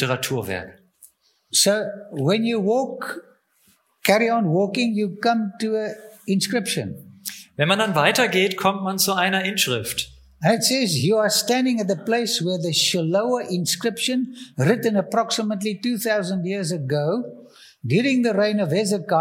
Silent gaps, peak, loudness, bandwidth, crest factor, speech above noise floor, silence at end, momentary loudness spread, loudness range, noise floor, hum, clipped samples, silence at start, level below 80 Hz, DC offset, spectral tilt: none; -2 dBFS; -21 LUFS; 17 kHz; 20 dB; 40 dB; 0 s; 11 LU; 3 LU; -62 dBFS; none; under 0.1%; 0 s; -64 dBFS; under 0.1%; -4 dB/octave